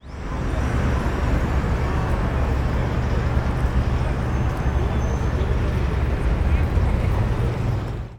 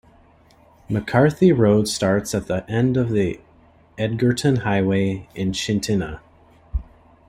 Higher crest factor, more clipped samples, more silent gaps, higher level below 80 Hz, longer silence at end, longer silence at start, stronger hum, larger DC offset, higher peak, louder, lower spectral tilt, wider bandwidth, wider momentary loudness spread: second, 12 dB vs 18 dB; neither; neither; first, -24 dBFS vs -42 dBFS; second, 0 s vs 0.45 s; second, 0.05 s vs 0.9 s; neither; neither; second, -8 dBFS vs -4 dBFS; second, -23 LUFS vs -20 LUFS; first, -7.5 dB/octave vs -6 dB/octave; second, 10 kHz vs 16 kHz; second, 2 LU vs 16 LU